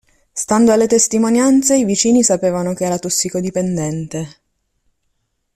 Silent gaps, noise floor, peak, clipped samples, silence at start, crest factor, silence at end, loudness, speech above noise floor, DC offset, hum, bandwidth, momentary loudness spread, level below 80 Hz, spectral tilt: none; -68 dBFS; 0 dBFS; under 0.1%; 0.35 s; 16 dB; 1.25 s; -15 LUFS; 53 dB; under 0.1%; none; 14.5 kHz; 13 LU; -52 dBFS; -4.5 dB/octave